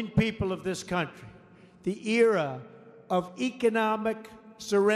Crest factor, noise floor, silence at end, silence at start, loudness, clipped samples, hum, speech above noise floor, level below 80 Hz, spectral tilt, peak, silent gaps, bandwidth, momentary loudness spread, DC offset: 18 dB; -54 dBFS; 0 s; 0 s; -28 LUFS; under 0.1%; none; 27 dB; -56 dBFS; -5.5 dB/octave; -10 dBFS; none; 14 kHz; 15 LU; under 0.1%